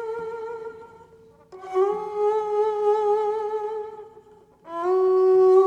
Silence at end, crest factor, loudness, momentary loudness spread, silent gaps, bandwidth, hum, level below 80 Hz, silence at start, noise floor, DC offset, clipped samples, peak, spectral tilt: 0 s; 16 dB; -23 LUFS; 19 LU; none; 7.2 kHz; none; -70 dBFS; 0 s; -52 dBFS; under 0.1%; under 0.1%; -8 dBFS; -6.5 dB/octave